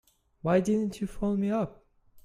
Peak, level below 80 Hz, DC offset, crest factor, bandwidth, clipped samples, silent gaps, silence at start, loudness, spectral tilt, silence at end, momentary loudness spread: -12 dBFS; -52 dBFS; under 0.1%; 18 dB; 12.5 kHz; under 0.1%; none; 0.45 s; -29 LUFS; -7.5 dB/octave; 0.05 s; 9 LU